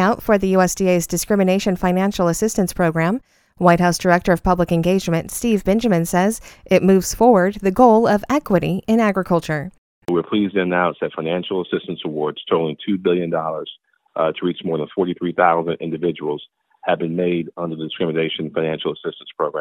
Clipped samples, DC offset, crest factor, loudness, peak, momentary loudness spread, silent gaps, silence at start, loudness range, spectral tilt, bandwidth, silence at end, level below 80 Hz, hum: under 0.1%; under 0.1%; 18 dB; -19 LUFS; 0 dBFS; 11 LU; 9.78-10.02 s; 0 s; 6 LU; -5.5 dB/octave; 18.5 kHz; 0 s; -44 dBFS; none